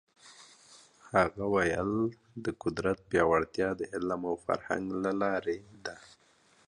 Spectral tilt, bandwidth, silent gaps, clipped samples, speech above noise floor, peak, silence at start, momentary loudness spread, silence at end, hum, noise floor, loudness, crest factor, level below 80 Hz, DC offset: -6 dB/octave; 11 kHz; none; under 0.1%; 34 dB; -10 dBFS; 0.25 s; 11 LU; 0.7 s; none; -65 dBFS; -31 LUFS; 22 dB; -58 dBFS; under 0.1%